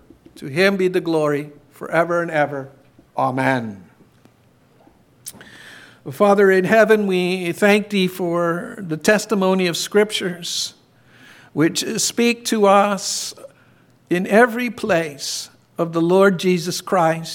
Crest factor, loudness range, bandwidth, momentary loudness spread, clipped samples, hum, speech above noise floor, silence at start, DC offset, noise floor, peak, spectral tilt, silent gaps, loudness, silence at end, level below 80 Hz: 18 dB; 6 LU; 17.5 kHz; 16 LU; under 0.1%; none; 37 dB; 0.4 s; under 0.1%; -55 dBFS; -2 dBFS; -4.5 dB/octave; none; -18 LUFS; 0 s; -66 dBFS